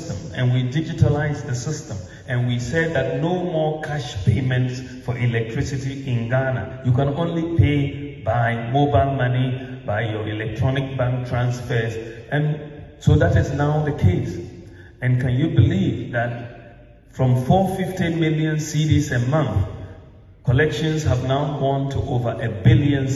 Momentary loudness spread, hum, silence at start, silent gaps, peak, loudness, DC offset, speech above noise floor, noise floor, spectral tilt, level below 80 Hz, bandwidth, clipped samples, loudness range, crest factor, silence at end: 10 LU; none; 0 s; none; -4 dBFS; -21 LUFS; under 0.1%; 25 dB; -45 dBFS; -7 dB/octave; -40 dBFS; 12 kHz; under 0.1%; 3 LU; 18 dB; 0 s